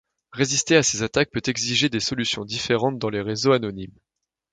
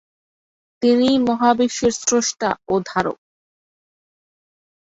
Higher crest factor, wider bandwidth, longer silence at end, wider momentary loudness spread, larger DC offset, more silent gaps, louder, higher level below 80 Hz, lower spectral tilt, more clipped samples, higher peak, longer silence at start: about the same, 20 dB vs 18 dB; first, 10 kHz vs 8 kHz; second, 0.65 s vs 1.75 s; first, 10 LU vs 7 LU; neither; neither; second, -22 LUFS vs -19 LUFS; about the same, -54 dBFS vs -56 dBFS; about the same, -3.5 dB/octave vs -3.5 dB/octave; neither; about the same, -4 dBFS vs -2 dBFS; second, 0.35 s vs 0.8 s